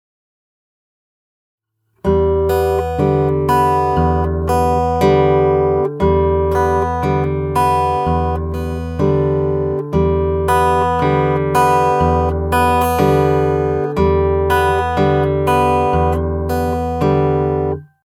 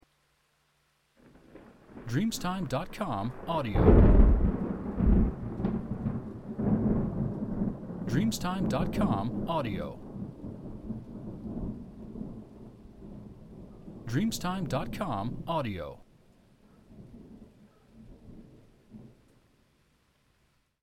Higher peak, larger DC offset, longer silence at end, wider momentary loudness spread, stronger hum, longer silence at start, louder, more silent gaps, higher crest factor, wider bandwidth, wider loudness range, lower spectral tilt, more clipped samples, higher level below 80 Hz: first, 0 dBFS vs -6 dBFS; neither; second, 0.25 s vs 1.75 s; second, 5 LU vs 23 LU; neither; first, 2.05 s vs 1.55 s; first, -15 LUFS vs -30 LUFS; neither; second, 16 dB vs 24 dB; about the same, 16.5 kHz vs 16 kHz; second, 2 LU vs 15 LU; about the same, -7.5 dB/octave vs -7 dB/octave; neither; first, -28 dBFS vs -34 dBFS